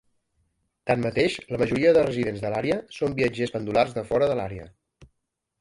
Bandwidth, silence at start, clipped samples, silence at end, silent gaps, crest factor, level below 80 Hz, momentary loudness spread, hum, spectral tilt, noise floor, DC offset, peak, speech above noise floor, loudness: 11.5 kHz; 0.85 s; under 0.1%; 0.55 s; none; 18 dB; -52 dBFS; 9 LU; none; -6.5 dB/octave; -79 dBFS; under 0.1%; -8 dBFS; 55 dB; -24 LUFS